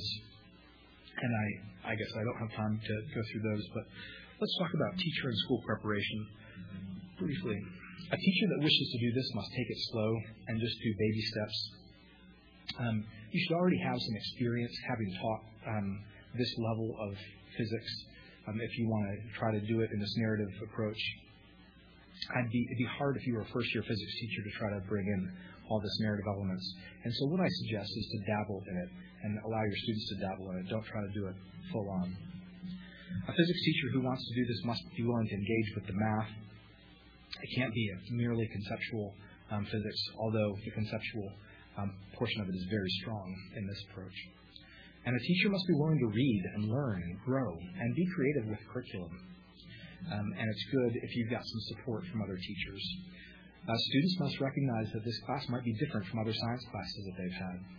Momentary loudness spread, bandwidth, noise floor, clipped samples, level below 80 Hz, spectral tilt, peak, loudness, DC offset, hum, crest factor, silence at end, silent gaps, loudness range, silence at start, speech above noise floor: 15 LU; 5.4 kHz; -59 dBFS; under 0.1%; -62 dBFS; -5 dB/octave; -14 dBFS; -36 LUFS; under 0.1%; none; 24 dB; 0 s; none; 5 LU; 0 s; 23 dB